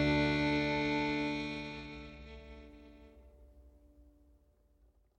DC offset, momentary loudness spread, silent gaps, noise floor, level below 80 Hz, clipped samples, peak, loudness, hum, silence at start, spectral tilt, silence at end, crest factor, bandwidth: under 0.1%; 23 LU; none; -68 dBFS; -52 dBFS; under 0.1%; -20 dBFS; -34 LUFS; none; 0 s; -6 dB/octave; 1.15 s; 16 dB; 9.2 kHz